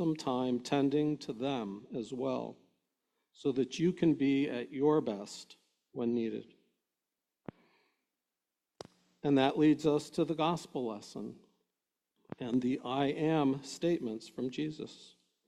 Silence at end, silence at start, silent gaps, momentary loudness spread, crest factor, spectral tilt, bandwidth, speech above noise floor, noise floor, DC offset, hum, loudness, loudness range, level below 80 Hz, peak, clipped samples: 0.4 s; 0 s; none; 18 LU; 20 dB; -6.5 dB/octave; 11.5 kHz; 57 dB; -90 dBFS; under 0.1%; none; -33 LUFS; 9 LU; -74 dBFS; -14 dBFS; under 0.1%